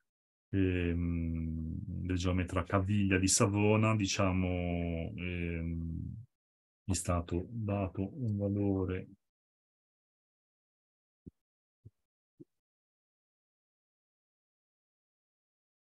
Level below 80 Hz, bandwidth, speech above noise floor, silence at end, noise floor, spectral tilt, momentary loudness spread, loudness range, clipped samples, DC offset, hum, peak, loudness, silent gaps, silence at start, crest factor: -52 dBFS; 12 kHz; over 58 dB; 3.45 s; under -90 dBFS; -5.5 dB/octave; 11 LU; 8 LU; under 0.1%; under 0.1%; none; -14 dBFS; -33 LUFS; 6.35-6.86 s, 9.29-11.26 s, 11.41-11.83 s, 12.05-12.38 s; 0.5 s; 22 dB